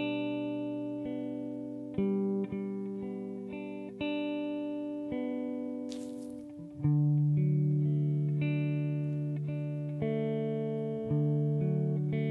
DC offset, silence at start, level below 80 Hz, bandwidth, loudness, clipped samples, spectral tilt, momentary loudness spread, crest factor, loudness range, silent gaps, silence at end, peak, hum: under 0.1%; 0 s; -64 dBFS; 6 kHz; -33 LUFS; under 0.1%; -9.5 dB/octave; 11 LU; 14 dB; 6 LU; none; 0 s; -18 dBFS; none